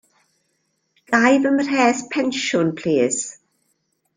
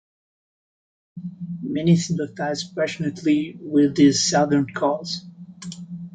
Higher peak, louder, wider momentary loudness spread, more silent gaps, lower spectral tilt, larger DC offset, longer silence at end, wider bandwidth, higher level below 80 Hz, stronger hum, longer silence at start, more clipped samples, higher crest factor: about the same, -2 dBFS vs -4 dBFS; about the same, -19 LUFS vs -21 LUFS; second, 7 LU vs 19 LU; neither; about the same, -4 dB/octave vs -5 dB/octave; neither; first, 0.85 s vs 0.05 s; about the same, 9.8 kHz vs 9.4 kHz; about the same, -64 dBFS vs -60 dBFS; neither; about the same, 1.1 s vs 1.15 s; neither; about the same, 18 dB vs 18 dB